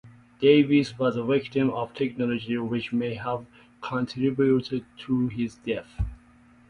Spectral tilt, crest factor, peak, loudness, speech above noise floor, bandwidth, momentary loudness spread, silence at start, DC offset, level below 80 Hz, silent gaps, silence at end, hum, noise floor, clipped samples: -7.5 dB/octave; 20 dB; -6 dBFS; -26 LUFS; 30 dB; 10 kHz; 13 LU; 0.05 s; under 0.1%; -46 dBFS; none; 0.55 s; none; -55 dBFS; under 0.1%